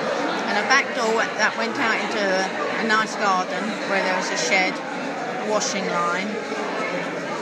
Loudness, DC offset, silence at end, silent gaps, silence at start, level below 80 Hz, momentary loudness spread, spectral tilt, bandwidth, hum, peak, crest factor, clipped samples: -22 LUFS; under 0.1%; 0 s; none; 0 s; -82 dBFS; 8 LU; -3 dB/octave; 15 kHz; none; -2 dBFS; 20 dB; under 0.1%